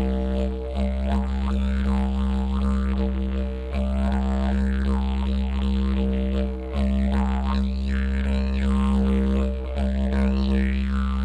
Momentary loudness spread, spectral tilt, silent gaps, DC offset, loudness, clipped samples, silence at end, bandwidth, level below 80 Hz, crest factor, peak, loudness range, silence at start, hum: 4 LU; -8.5 dB/octave; none; under 0.1%; -24 LUFS; under 0.1%; 0 s; 8.4 kHz; -24 dBFS; 12 dB; -12 dBFS; 1 LU; 0 s; none